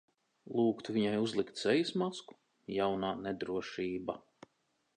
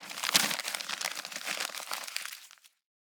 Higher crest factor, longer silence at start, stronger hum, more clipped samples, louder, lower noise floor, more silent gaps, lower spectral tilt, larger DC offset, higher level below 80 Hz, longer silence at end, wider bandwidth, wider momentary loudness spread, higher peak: second, 20 dB vs 34 dB; first, 0.45 s vs 0 s; neither; neither; second, -35 LUFS vs -32 LUFS; first, -78 dBFS vs -56 dBFS; neither; first, -5.5 dB/octave vs 0.5 dB/octave; neither; first, -70 dBFS vs under -90 dBFS; first, 0.75 s vs 0.45 s; second, 9.8 kHz vs over 20 kHz; about the same, 10 LU vs 12 LU; second, -16 dBFS vs 0 dBFS